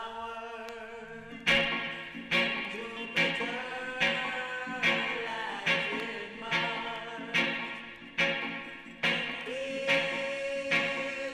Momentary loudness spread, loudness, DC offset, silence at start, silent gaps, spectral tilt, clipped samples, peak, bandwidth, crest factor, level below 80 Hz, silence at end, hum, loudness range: 12 LU; -30 LUFS; under 0.1%; 0 s; none; -3.5 dB/octave; under 0.1%; -12 dBFS; 14.5 kHz; 20 dB; -64 dBFS; 0 s; none; 2 LU